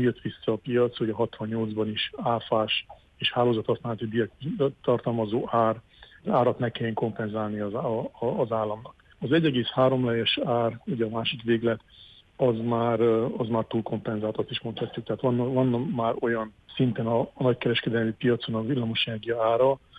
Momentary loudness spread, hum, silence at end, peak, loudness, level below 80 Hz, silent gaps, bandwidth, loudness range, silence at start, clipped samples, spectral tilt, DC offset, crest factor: 7 LU; none; 0 s; -10 dBFS; -27 LUFS; -60 dBFS; none; 5 kHz; 2 LU; 0 s; under 0.1%; -8.5 dB/octave; under 0.1%; 16 dB